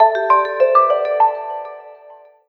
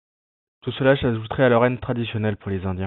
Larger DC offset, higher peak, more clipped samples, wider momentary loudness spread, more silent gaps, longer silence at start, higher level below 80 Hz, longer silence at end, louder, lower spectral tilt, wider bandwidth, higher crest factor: neither; first, 0 dBFS vs -4 dBFS; neither; first, 16 LU vs 10 LU; neither; second, 0 s vs 0.65 s; second, -70 dBFS vs -48 dBFS; first, 0.35 s vs 0 s; first, -15 LUFS vs -21 LUFS; second, -4 dB/octave vs -11 dB/octave; first, 6 kHz vs 4.2 kHz; about the same, 16 dB vs 18 dB